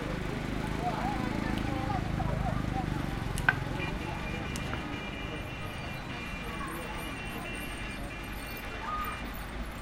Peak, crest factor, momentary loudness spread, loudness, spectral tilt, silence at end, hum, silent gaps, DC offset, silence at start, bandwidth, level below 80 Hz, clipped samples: -8 dBFS; 26 dB; 6 LU; -35 LUFS; -5.5 dB/octave; 0 s; none; none; under 0.1%; 0 s; 16.5 kHz; -42 dBFS; under 0.1%